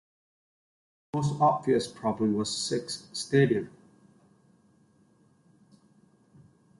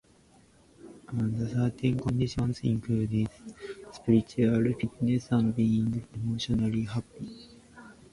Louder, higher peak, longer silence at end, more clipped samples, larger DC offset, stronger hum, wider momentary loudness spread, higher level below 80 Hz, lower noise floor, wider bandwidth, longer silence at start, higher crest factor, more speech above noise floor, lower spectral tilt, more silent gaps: about the same, -28 LUFS vs -29 LUFS; about the same, -10 dBFS vs -10 dBFS; first, 3.1 s vs 0.2 s; neither; neither; neither; second, 11 LU vs 17 LU; second, -66 dBFS vs -52 dBFS; first, -64 dBFS vs -60 dBFS; about the same, 11.5 kHz vs 11.5 kHz; first, 1.15 s vs 0.85 s; about the same, 20 dB vs 18 dB; first, 37 dB vs 32 dB; second, -5.5 dB/octave vs -7.5 dB/octave; neither